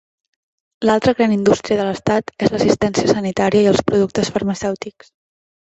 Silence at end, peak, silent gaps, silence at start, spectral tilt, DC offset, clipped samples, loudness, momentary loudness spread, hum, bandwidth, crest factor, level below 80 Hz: 0.7 s; -2 dBFS; none; 0.8 s; -5.5 dB/octave; under 0.1%; under 0.1%; -17 LUFS; 7 LU; none; 8.2 kHz; 16 dB; -48 dBFS